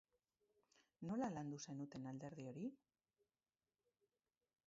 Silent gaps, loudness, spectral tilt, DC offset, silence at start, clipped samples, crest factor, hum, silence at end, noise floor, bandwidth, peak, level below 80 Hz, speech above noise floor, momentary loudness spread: none; -50 LUFS; -7 dB/octave; under 0.1%; 1 s; under 0.1%; 20 dB; none; 1.9 s; under -90 dBFS; 7.4 kHz; -34 dBFS; -84 dBFS; over 41 dB; 8 LU